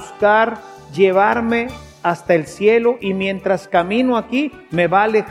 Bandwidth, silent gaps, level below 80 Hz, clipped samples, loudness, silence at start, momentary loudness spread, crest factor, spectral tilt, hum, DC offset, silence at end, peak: 12.5 kHz; none; -50 dBFS; under 0.1%; -17 LUFS; 0 s; 8 LU; 16 dB; -6 dB/octave; none; under 0.1%; 0 s; 0 dBFS